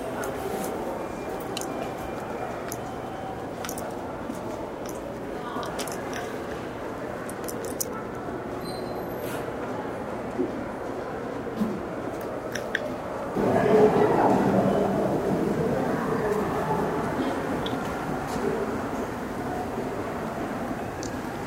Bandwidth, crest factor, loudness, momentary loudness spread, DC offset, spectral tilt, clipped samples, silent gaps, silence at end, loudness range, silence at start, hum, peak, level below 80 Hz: 16 kHz; 22 dB; -29 LUFS; 11 LU; under 0.1%; -5.5 dB/octave; under 0.1%; none; 0 s; 10 LU; 0 s; none; -6 dBFS; -50 dBFS